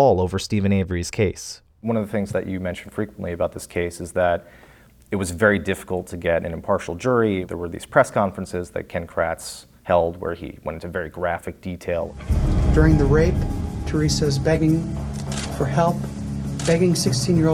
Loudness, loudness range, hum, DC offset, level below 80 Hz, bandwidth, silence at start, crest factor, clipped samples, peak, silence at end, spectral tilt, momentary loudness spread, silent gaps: -22 LUFS; 6 LU; none; under 0.1%; -32 dBFS; 18 kHz; 0 s; 20 dB; under 0.1%; -2 dBFS; 0 s; -6 dB/octave; 11 LU; none